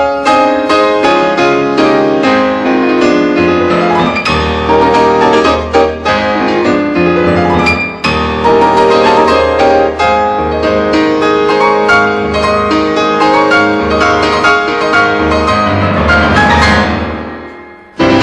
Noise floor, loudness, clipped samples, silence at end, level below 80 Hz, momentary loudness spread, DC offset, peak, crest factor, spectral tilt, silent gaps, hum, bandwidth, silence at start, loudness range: -31 dBFS; -9 LUFS; 0.2%; 0 s; -28 dBFS; 4 LU; under 0.1%; 0 dBFS; 10 dB; -5.5 dB/octave; none; none; 11.5 kHz; 0 s; 1 LU